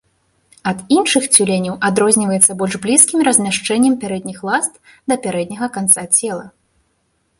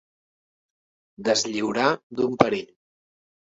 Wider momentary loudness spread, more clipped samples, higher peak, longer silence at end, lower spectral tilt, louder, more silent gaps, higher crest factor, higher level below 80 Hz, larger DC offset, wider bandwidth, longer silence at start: first, 12 LU vs 7 LU; neither; about the same, 0 dBFS vs 0 dBFS; about the same, 0.9 s vs 0.85 s; about the same, -3 dB/octave vs -3.5 dB/octave; first, -14 LUFS vs -24 LUFS; second, none vs 2.03-2.10 s; second, 16 dB vs 26 dB; first, -58 dBFS vs -64 dBFS; neither; first, 16 kHz vs 8 kHz; second, 0.65 s vs 1.2 s